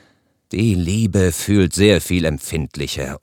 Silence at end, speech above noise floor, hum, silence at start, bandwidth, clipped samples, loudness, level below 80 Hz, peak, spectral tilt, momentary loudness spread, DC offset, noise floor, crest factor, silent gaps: 0.05 s; 41 dB; none; 0.5 s; 18 kHz; under 0.1%; -18 LUFS; -38 dBFS; 0 dBFS; -5.5 dB/octave; 10 LU; under 0.1%; -58 dBFS; 18 dB; none